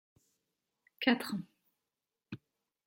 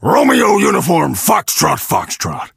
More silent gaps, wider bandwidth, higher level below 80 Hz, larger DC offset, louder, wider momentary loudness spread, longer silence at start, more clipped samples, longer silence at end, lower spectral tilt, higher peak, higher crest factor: neither; about the same, 16.5 kHz vs 16 kHz; second, -82 dBFS vs -46 dBFS; neither; second, -34 LUFS vs -13 LUFS; first, 20 LU vs 7 LU; first, 1 s vs 0 s; neither; first, 0.5 s vs 0.1 s; about the same, -5 dB/octave vs -4 dB/octave; second, -12 dBFS vs 0 dBFS; first, 28 dB vs 14 dB